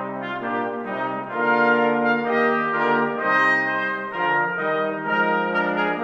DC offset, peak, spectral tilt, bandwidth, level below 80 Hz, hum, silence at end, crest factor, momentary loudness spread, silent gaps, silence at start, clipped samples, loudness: under 0.1%; -8 dBFS; -6.5 dB/octave; 8 kHz; -70 dBFS; none; 0 s; 14 dB; 9 LU; none; 0 s; under 0.1%; -21 LUFS